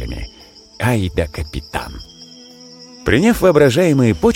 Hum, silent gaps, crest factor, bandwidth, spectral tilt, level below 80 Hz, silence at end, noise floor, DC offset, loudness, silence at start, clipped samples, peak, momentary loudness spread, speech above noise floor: none; none; 16 dB; 17 kHz; -6 dB/octave; -34 dBFS; 0 s; -43 dBFS; under 0.1%; -16 LUFS; 0 s; under 0.1%; -2 dBFS; 24 LU; 28 dB